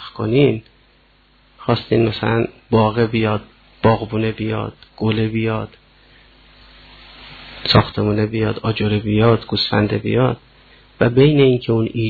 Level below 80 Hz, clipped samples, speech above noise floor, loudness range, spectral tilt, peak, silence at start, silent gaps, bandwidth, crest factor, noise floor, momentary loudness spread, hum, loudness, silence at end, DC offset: -42 dBFS; under 0.1%; 37 dB; 5 LU; -9 dB/octave; 0 dBFS; 0 s; none; 4.8 kHz; 18 dB; -54 dBFS; 11 LU; none; -18 LUFS; 0 s; under 0.1%